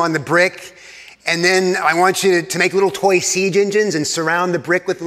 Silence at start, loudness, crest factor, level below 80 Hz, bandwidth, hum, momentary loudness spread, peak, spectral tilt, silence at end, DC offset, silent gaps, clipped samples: 0 s; -16 LUFS; 16 dB; -64 dBFS; 15.5 kHz; none; 4 LU; 0 dBFS; -3.5 dB/octave; 0 s; under 0.1%; none; under 0.1%